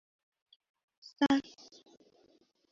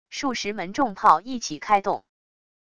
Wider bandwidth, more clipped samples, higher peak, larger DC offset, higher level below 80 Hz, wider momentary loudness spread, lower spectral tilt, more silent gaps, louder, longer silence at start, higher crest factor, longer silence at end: second, 7.4 kHz vs 10.5 kHz; neither; second, -14 dBFS vs -4 dBFS; second, under 0.1% vs 0.4%; second, -74 dBFS vs -60 dBFS; first, 26 LU vs 11 LU; about the same, -2.5 dB/octave vs -3.5 dB/octave; neither; second, -31 LUFS vs -23 LUFS; first, 1.2 s vs 0.1 s; about the same, 24 dB vs 22 dB; first, 1.3 s vs 0.8 s